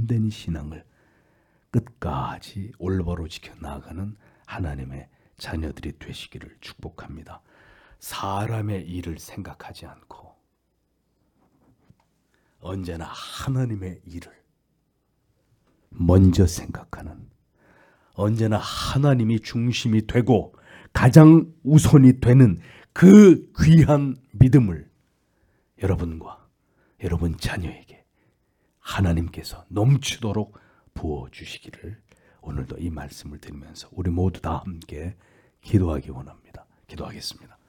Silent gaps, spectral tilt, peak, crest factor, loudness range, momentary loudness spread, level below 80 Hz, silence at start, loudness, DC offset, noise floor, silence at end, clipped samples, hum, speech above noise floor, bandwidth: none; -7.5 dB/octave; 0 dBFS; 22 dB; 20 LU; 25 LU; -42 dBFS; 0 s; -20 LUFS; under 0.1%; -71 dBFS; 0.35 s; under 0.1%; none; 51 dB; 18 kHz